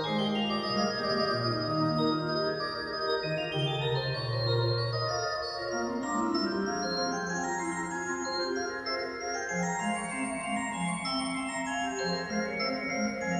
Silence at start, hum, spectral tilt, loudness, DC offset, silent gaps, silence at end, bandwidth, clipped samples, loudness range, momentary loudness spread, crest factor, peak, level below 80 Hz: 0 s; none; -4.5 dB/octave; -31 LUFS; under 0.1%; none; 0 s; 12 kHz; under 0.1%; 3 LU; 4 LU; 14 dB; -16 dBFS; -60 dBFS